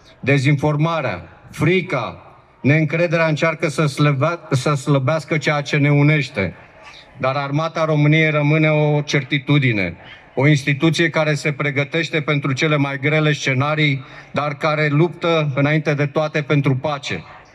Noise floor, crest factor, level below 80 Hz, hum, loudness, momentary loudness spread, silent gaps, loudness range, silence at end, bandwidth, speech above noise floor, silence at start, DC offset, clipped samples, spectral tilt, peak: -42 dBFS; 14 dB; -58 dBFS; none; -18 LUFS; 8 LU; none; 2 LU; 0.15 s; 11 kHz; 25 dB; 0.25 s; under 0.1%; under 0.1%; -6.5 dB/octave; -4 dBFS